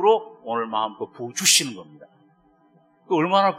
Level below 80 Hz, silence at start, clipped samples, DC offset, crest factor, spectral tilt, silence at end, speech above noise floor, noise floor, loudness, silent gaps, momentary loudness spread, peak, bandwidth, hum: -78 dBFS; 0 s; under 0.1%; under 0.1%; 20 dB; -2 dB/octave; 0 s; 37 dB; -59 dBFS; -21 LUFS; none; 16 LU; -2 dBFS; 15 kHz; none